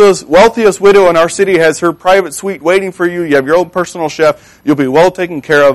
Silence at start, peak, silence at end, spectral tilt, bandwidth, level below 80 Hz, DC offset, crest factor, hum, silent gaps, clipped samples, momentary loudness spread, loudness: 0 s; 0 dBFS; 0 s; -4.5 dB/octave; 13 kHz; -42 dBFS; under 0.1%; 10 dB; none; none; under 0.1%; 9 LU; -10 LUFS